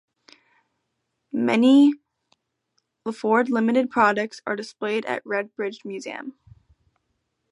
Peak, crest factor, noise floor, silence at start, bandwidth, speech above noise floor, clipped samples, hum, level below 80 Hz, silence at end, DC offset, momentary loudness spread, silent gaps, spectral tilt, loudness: -4 dBFS; 20 dB; -77 dBFS; 1.35 s; 10.5 kHz; 56 dB; under 0.1%; none; -70 dBFS; 1.2 s; under 0.1%; 18 LU; none; -5.5 dB/octave; -22 LUFS